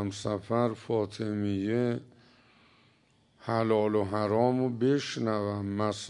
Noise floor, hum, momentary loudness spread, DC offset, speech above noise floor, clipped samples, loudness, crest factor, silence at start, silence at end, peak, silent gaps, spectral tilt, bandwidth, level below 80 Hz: -66 dBFS; none; 6 LU; under 0.1%; 37 dB; under 0.1%; -30 LUFS; 18 dB; 0 s; 0 s; -12 dBFS; none; -6.5 dB/octave; 11 kHz; -70 dBFS